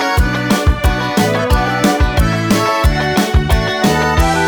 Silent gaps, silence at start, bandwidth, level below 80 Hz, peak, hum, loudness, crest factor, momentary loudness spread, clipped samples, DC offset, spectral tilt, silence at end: none; 0 s; over 20 kHz; -18 dBFS; 0 dBFS; none; -14 LUFS; 12 dB; 2 LU; under 0.1%; under 0.1%; -5 dB/octave; 0 s